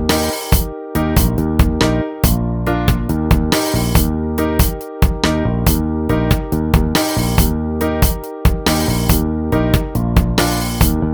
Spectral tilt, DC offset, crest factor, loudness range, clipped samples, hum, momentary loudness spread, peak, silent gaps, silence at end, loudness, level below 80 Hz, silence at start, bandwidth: -5.5 dB/octave; 0.4%; 14 dB; 0 LU; under 0.1%; none; 3 LU; 0 dBFS; none; 0 s; -16 LUFS; -20 dBFS; 0 s; over 20 kHz